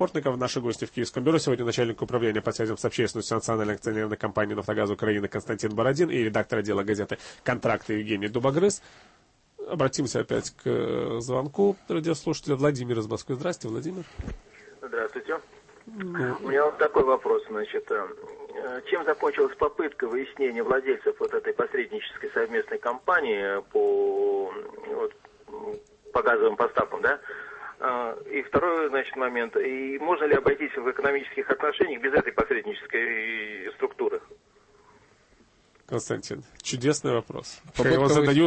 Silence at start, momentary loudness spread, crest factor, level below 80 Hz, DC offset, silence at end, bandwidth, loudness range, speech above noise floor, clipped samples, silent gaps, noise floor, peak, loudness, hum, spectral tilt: 0 s; 11 LU; 16 dB; -56 dBFS; under 0.1%; 0 s; 8.8 kHz; 5 LU; 34 dB; under 0.1%; none; -61 dBFS; -10 dBFS; -27 LUFS; none; -5 dB/octave